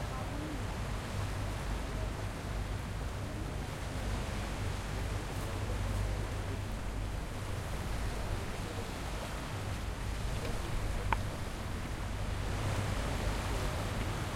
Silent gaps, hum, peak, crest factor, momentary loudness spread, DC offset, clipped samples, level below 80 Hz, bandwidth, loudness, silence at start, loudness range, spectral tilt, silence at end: none; none; -14 dBFS; 22 dB; 4 LU; under 0.1%; under 0.1%; -40 dBFS; 16 kHz; -38 LUFS; 0 s; 2 LU; -5 dB/octave; 0 s